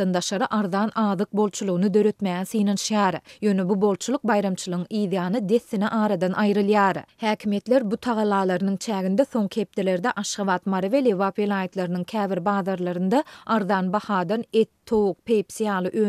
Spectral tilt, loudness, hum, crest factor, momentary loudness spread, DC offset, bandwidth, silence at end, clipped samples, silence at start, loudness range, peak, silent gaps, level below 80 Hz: -5.5 dB/octave; -23 LUFS; none; 16 dB; 5 LU; under 0.1%; 13.5 kHz; 0 s; under 0.1%; 0 s; 2 LU; -8 dBFS; none; -64 dBFS